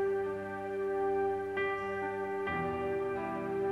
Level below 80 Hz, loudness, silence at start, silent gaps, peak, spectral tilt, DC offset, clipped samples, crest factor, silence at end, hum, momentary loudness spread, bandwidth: -62 dBFS; -35 LUFS; 0 s; none; -24 dBFS; -7 dB/octave; under 0.1%; under 0.1%; 10 dB; 0 s; none; 4 LU; 10.5 kHz